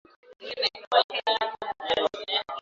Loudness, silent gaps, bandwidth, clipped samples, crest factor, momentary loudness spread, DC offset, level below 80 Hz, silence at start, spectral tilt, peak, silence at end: -27 LUFS; 0.87-0.91 s, 1.04-1.09 s; 7.8 kHz; under 0.1%; 22 dB; 10 LU; under 0.1%; -68 dBFS; 0.3 s; -2 dB/octave; -6 dBFS; 0 s